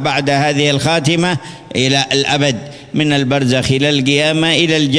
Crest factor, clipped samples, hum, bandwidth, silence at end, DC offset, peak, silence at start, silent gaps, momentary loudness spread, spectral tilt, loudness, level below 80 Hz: 14 dB; under 0.1%; none; 11 kHz; 0 s; under 0.1%; 0 dBFS; 0 s; none; 6 LU; -4.5 dB/octave; -13 LUFS; -46 dBFS